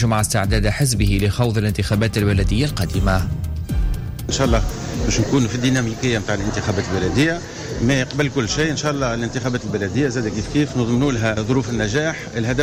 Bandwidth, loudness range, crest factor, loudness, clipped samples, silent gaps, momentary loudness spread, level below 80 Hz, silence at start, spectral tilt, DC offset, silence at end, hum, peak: 16 kHz; 2 LU; 12 dB; -20 LUFS; under 0.1%; none; 6 LU; -28 dBFS; 0 s; -5.5 dB/octave; under 0.1%; 0 s; none; -6 dBFS